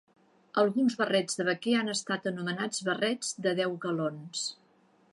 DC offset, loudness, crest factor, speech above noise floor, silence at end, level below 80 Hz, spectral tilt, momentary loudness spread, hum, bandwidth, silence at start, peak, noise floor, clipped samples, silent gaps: under 0.1%; -30 LUFS; 18 dB; 35 dB; 0.6 s; -82 dBFS; -4 dB/octave; 8 LU; none; 11.5 kHz; 0.55 s; -12 dBFS; -65 dBFS; under 0.1%; none